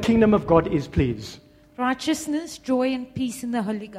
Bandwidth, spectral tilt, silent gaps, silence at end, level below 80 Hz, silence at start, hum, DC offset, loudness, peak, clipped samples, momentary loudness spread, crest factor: 15 kHz; -6 dB/octave; none; 0 s; -42 dBFS; 0 s; none; under 0.1%; -23 LUFS; -4 dBFS; under 0.1%; 11 LU; 20 dB